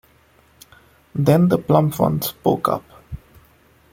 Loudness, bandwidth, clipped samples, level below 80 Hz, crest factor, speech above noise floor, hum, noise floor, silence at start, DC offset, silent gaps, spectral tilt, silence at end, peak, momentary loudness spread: -19 LUFS; 17 kHz; under 0.1%; -50 dBFS; 18 dB; 38 dB; none; -55 dBFS; 1.15 s; under 0.1%; none; -7.5 dB/octave; 0.75 s; -2 dBFS; 22 LU